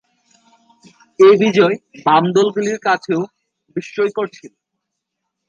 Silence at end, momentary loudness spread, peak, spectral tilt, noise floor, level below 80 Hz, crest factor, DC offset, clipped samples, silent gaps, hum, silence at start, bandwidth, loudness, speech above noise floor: 1 s; 16 LU; 0 dBFS; -5.5 dB/octave; -77 dBFS; -68 dBFS; 16 dB; under 0.1%; under 0.1%; none; none; 1.2 s; 7.4 kHz; -15 LUFS; 62 dB